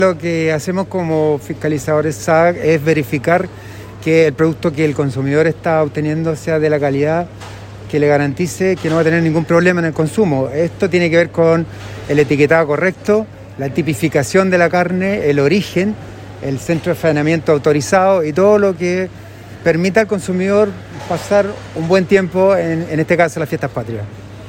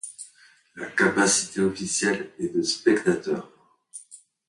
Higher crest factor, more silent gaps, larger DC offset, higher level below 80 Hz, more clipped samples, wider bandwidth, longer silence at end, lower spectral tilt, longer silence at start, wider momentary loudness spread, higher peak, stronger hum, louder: second, 14 dB vs 20 dB; neither; neither; first, -46 dBFS vs -62 dBFS; neither; first, 16.5 kHz vs 11.5 kHz; second, 0 s vs 0.35 s; first, -6.5 dB/octave vs -3 dB/octave; about the same, 0 s vs 0.05 s; second, 11 LU vs 22 LU; first, 0 dBFS vs -6 dBFS; neither; first, -15 LUFS vs -24 LUFS